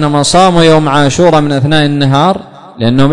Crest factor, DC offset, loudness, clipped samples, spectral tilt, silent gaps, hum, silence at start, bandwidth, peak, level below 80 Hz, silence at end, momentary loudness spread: 8 dB; under 0.1%; -8 LUFS; 0.6%; -5.5 dB/octave; none; none; 0 s; 11 kHz; 0 dBFS; -34 dBFS; 0 s; 6 LU